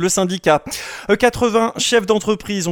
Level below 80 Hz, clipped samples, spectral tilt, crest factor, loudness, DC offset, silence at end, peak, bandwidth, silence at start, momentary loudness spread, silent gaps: -44 dBFS; under 0.1%; -3.5 dB/octave; 16 dB; -17 LUFS; under 0.1%; 0 s; 0 dBFS; 18 kHz; 0 s; 6 LU; none